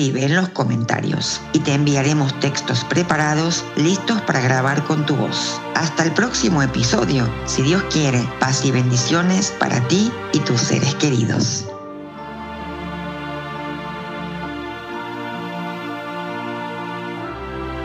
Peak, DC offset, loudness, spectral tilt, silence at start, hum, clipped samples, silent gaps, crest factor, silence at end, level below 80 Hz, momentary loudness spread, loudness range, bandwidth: -2 dBFS; under 0.1%; -20 LUFS; -4.5 dB/octave; 0 s; none; under 0.1%; none; 18 dB; 0 s; -44 dBFS; 11 LU; 10 LU; 9 kHz